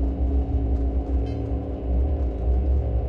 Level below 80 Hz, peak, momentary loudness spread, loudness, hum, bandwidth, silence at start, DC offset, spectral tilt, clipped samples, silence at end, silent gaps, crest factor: -24 dBFS; -12 dBFS; 4 LU; -26 LUFS; none; 3.3 kHz; 0 s; under 0.1%; -11 dB/octave; under 0.1%; 0 s; none; 10 dB